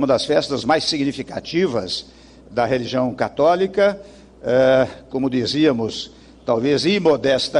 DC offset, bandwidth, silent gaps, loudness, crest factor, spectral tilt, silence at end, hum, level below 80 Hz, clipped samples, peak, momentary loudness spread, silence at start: under 0.1%; 11 kHz; none; -19 LUFS; 14 dB; -5 dB/octave; 0 s; none; -50 dBFS; under 0.1%; -4 dBFS; 11 LU; 0 s